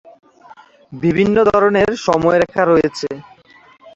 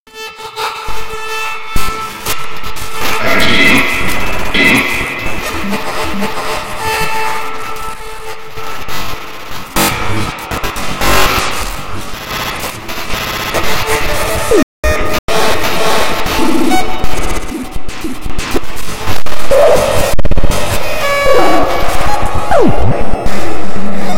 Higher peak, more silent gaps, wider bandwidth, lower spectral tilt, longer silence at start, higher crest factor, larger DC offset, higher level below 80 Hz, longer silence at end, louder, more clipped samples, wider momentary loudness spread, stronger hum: about the same, 0 dBFS vs 0 dBFS; second, none vs 0.00-0.06 s, 14.63-14.83 s, 15.19-15.28 s; second, 8 kHz vs 17 kHz; first, -6.5 dB/octave vs -3.5 dB/octave; first, 0.9 s vs 0 s; first, 16 dB vs 8 dB; neither; second, -46 dBFS vs -24 dBFS; about the same, 0.05 s vs 0 s; about the same, -15 LUFS vs -14 LUFS; second, under 0.1% vs 3%; about the same, 11 LU vs 13 LU; neither